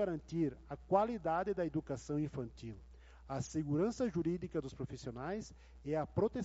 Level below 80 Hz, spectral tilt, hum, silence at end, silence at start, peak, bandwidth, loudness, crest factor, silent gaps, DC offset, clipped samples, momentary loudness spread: -58 dBFS; -7.5 dB/octave; none; 0 s; 0 s; -18 dBFS; 8 kHz; -39 LUFS; 20 dB; none; under 0.1%; under 0.1%; 13 LU